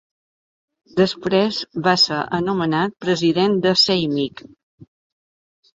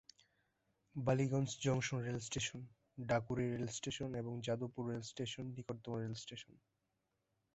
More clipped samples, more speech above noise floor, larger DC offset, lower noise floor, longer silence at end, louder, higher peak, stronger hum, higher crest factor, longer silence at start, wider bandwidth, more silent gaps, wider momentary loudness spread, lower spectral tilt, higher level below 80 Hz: neither; first, over 71 dB vs 45 dB; neither; first, under -90 dBFS vs -86 dBFS; second, 0.95 s vs 1.15 s; first, -18 LUFS vs -41 LUFS; first, -2 dBFS vs -22 dBFS; neither; about the same, 18 dB vs 20 dB; about the same, 0.95 s vs 0.95 s; about the same, 7.8 kHz vs 8 kHz; first, 4.63-4.78 s vs none; second, 7 LU vs 13 LU; about the same, -5 dB/octave vs -5.5 dB/octave; first, -58 dBFS vs -68 dBFS